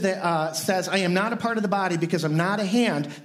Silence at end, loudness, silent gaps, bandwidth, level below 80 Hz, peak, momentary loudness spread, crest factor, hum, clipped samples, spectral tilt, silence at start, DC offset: 0 s; -24 LUFS; none; 16 kHz; -72 dBFS; -8 dBFS; 3 LU; 16 dB; none; under 0.1%; -5 dB/octave; 0 s; under 0.1%